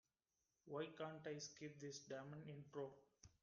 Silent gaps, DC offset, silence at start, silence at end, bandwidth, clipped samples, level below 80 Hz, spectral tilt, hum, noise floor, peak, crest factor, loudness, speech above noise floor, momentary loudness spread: none; under 0.1%; 0.65 s; 0.15 s; 7.2 kHz; under 0.1%; -86 dBFS; -4.5 dB/octave; none; under -90 dBFS; -38 dBFS; 18 dB; -54 LUFS; over 37 dB; 5 LU